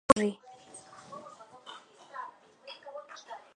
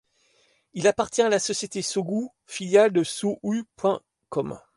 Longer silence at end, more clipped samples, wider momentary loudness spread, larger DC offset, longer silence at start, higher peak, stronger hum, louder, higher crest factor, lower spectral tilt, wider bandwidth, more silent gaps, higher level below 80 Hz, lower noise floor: about the same, 0.15 s vs 0.2 s; neither; first, 20 LU vs 13 LU; neither; second, 0.1 s vs 0.75 s; about the same, -6 dBFS vs -6 dBFS; neither; second, -33 LUFS vs -25 LUFS; first, 30 dB vs 18 dB; about the same, -4.5 dB/octave vs -4 dB/octave; about the same, 11 kHz vs 11.5 kHz; neither; about the same, -62 dBFS vs -66 dBFS; second, -52 dBFS vs -65 dBFS